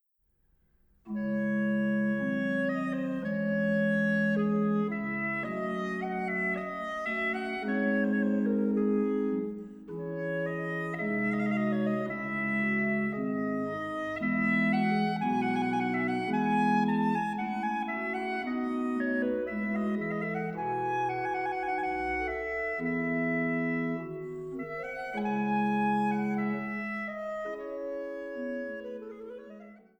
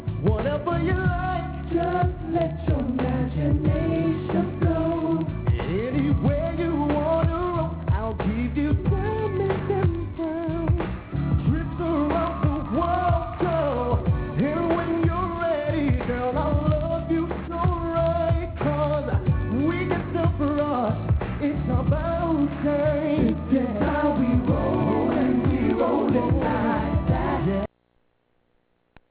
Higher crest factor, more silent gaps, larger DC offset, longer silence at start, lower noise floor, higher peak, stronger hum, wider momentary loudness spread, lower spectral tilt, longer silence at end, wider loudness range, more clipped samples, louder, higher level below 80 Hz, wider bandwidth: about the same, 14 dB vs 14 dB; neither; neither; first, 1.05 s vs 0 s; first, -72 dBFS vs -68 dBFS; second, -16 dBFS vs -8 dBFS; neither; first, 10 LU vs 4 LU; second, -8 dB/octave vs -12 dB/octave; second, 0.2 s vs 1.45 s; about the same, 3 LU vs 3 LU; neither; second, -30 LUFS vs -24 LUFS; second, -62 dBFS vs -32 dBFS; first, 8.8 kHz vs 4 kHz